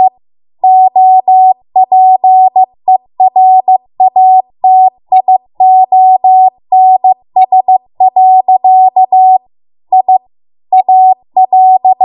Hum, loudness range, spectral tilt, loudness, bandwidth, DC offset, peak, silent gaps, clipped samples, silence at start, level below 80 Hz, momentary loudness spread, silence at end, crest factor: none; 1 LU; -5.5 dB/octave; -7 LUFS; 4 kHz; under 0.1%; 0 dBFS; none; 0.2%; 0 s; -66 dBFS; 6 LU; 0 s; 6 dB